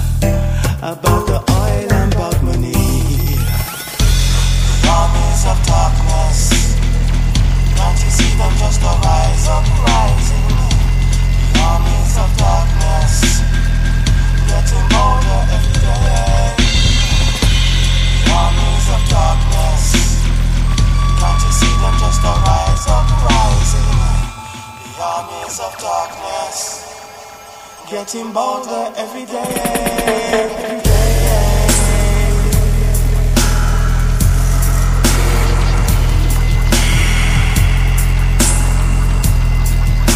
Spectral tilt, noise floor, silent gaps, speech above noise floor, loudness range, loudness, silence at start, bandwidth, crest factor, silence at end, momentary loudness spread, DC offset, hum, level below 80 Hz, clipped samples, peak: -4.5 dB/octave; -34 dBFS; none; 20 dB; 6 LU; -15 LUFS; 0 s; 16 kHz; 12 dB; 0 s; 8 LU; under 0.1%; none; -14 dBFS; under 0.1%; 0 dBFS